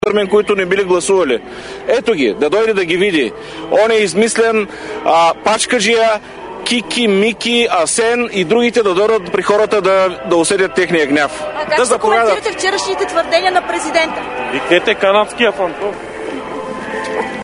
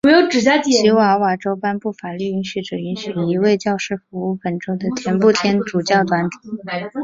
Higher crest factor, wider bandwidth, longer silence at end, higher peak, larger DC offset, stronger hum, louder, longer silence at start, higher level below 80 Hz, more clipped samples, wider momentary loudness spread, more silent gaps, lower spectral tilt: about the same, 14 dB vs 16 dB; first, 11 kHz vs 7.8 kHz; about the same, 0 s vs 0 s; about the same, 0 dBFS vs -2 dBFS; neither; neither; first, -14 LUFS vs -18 LUFS; about the same, 0.05 s vs 0.05 s; first, -48 dBFS vs -58 dBFS; neither; about the same, 10 LU vs 12 LU; neither; second, -3 dB/octave vs -5 dB/octave